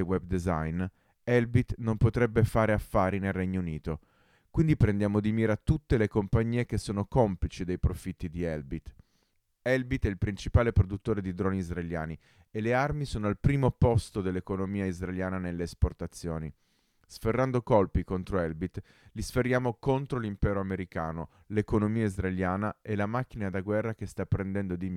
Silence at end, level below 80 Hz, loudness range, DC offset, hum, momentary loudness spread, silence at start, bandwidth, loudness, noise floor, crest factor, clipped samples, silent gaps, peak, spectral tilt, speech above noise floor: 0 s; -42 dBFS; 4 LU; under 0.1%; none; 11 LU; 0 s; 14.5 kHz; -30 LUFS; -73 dBFS; 18 dB; under 0.1%; none; -10 dBFS; -8 dB/octave; 44 dB